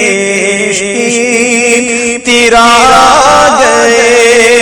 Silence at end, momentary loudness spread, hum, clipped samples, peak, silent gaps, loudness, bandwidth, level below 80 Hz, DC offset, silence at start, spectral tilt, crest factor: 0 s; 7 LU; none; 4%; 0 dBFS; none; -5 LUFS; over 20 kHz; -36 dBFS; under 0.1%; 0 s; -2 dB/octave; 6 dB